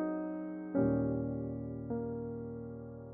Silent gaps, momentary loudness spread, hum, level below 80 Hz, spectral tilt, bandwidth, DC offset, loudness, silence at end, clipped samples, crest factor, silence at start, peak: none; 12 LU; none; -56 dBFS; -8.5 dB/octave; 2.7 kHz; under 0.1%; -37 LUFS; 0 s; under 0.1%; 16 dB; 0 s; -20 dBFS